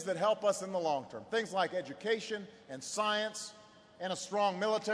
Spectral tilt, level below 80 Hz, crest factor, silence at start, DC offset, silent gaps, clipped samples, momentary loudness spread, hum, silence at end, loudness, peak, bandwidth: -3 dB/octave; -82 dBFS; 18 dB; 0 s; under 0.1%; none; under 0.1%; 12 LU; none; 0 s; -35 LUFS; -18 dBFS; 11 kHz